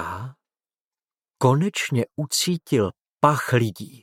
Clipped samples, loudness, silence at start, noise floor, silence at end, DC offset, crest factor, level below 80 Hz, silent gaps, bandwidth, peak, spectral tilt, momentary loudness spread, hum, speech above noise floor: under 0.1%; -22 LUFS; 0 s; under -90 dBFS; 0.15 s; under 0.1%; 22 dB; -66 dBFS; 0.81-0.91 s; 16.5 kHz; -2 dBFS; -5 dB/octave; 9 LU; none; over 68 dB